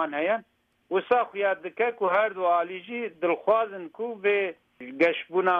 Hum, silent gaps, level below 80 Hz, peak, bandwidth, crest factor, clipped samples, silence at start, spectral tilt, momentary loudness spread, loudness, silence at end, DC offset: none; none; -76 dBFS; -10 dBFS; 5.6 kHz; 16 dB; under 0.1%; 0 s; -6.5 dB/octave; 10 LU; -26 LUFS; 0 s; under 0.1%